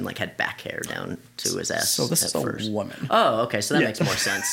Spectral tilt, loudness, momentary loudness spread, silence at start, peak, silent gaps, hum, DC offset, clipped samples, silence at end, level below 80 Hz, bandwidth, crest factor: -3 dB/octave; -24 LUFS; 10 LU; 0 s; -6 dBFS; none; none; under 0.1%; under 0.1%; 0 s; -60 dBFS; 17 kHz; 18 dB